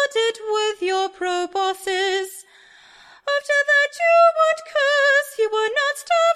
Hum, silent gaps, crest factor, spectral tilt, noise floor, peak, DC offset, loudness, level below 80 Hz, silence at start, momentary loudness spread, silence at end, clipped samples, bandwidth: none; none; 16 dB; 0.5 dB/octave; -50 dBFS; -4 dBFS; under 0.1%; -19 LUFS; -68 dBFS; 0 s; 9 LU; 0 s; under 0.1%; 15 kHz